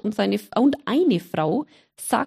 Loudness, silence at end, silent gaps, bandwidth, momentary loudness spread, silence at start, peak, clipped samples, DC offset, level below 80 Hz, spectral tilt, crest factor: -22 LUFS; 0 s; none; 15.5 kHz; 9 LU; 0.05 s; -6 dBFS; under 0.1%; under 0.1%; -64 dBFS; -5.5 dB/octave; 16 dB